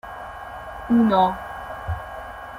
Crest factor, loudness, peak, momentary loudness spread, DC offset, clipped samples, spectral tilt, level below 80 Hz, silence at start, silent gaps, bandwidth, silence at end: 18 dB; -22 LUFS; -6 dBFS; 17 LU; under 0.1%; under 0.1%; -7.5 dB/octave; -44 dBFS; 0.05 s; none; 15 kHz; 0 s